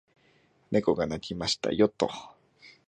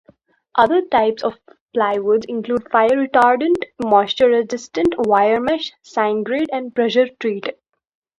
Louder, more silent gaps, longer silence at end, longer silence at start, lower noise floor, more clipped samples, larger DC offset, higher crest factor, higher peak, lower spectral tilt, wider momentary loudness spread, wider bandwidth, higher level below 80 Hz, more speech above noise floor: second, -28 LUFS vs -18 LUFS; second, none vs 1.61-1.68 s; second, 0.15 s vs 0.7 s; first, 0.7 s vs 0.55 s; first, -65 dBFS vs -54 dBFS; neither; neither; about the same, 22 dB vs 18 dB; second, -10 dBFS vs 0 dBFS; about the same, -5 dB/octave vs -5 dB/octave; about the same, 7 LU vs 9 LU; about the same, 9.6 kHz vs 10.5 kHz; about the same, -58 dBFS vs -56 dBFS; about the same, 37 dB vs 37 dB